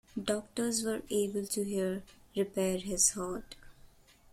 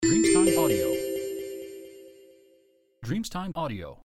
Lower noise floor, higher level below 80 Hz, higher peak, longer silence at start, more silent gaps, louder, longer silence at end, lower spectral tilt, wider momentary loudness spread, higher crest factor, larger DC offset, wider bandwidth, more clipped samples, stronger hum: second, -59 dBFS vs -63 dBFS; second, -58 dBFS vs -52 dBFS; second, -14 dBFS vs -10 dBFS; first, 0.15 s vs 0 s; neither; second, -33 LUFS vs -26 LUFS; first, 0.45 s vs 0.1 s; about the same, -3.5 dB/octave vs -4.5 dB/octave; second, 14 LU vs 22 LU; about the same, 22 dB vs 18 dB; neither; about the same, 16.5 kHz vs 15 kHz; neither; neither